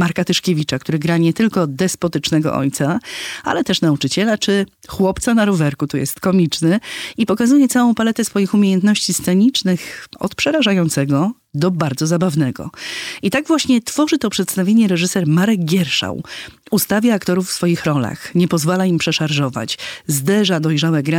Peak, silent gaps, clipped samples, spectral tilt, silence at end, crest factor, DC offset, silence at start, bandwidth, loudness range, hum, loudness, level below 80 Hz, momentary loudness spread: -4 dBFS; none; under 0.1%; -5 dB/octave; 0 s; 12 dB; under 0.1%; 0 s; 18 kHz; 3 LU; none; -17 LUFS; -50 dBFS; 8 LU